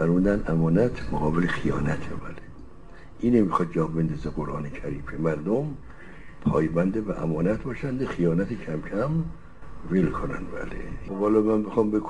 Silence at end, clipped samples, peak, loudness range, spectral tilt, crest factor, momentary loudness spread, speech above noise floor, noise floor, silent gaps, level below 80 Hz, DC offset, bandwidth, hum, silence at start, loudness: 0 s; under 0.1%; -8 dBFS; 2 LU; -9 dB/octave; 18 dB; 14 LU; 21 dB; -46 dBFS; none; -40 dBFS; 1%; 10 kHz; none; 0 s; -26 LUFS